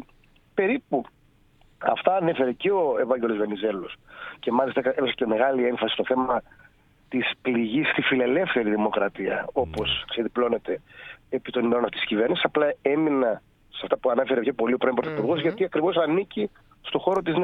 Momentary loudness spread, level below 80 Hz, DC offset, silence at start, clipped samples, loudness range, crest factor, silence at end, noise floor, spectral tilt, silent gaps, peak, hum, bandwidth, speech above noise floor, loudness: 9 LU; -56 dBFS; under 0.1%; 0 s; under 0.1%; 2 LU; 20 dB; 0 s; -58 dBFS; -7.5 dB/octave; none; -4 dBFS; none; 5.2 kHz; 34 dB; -25 LUFS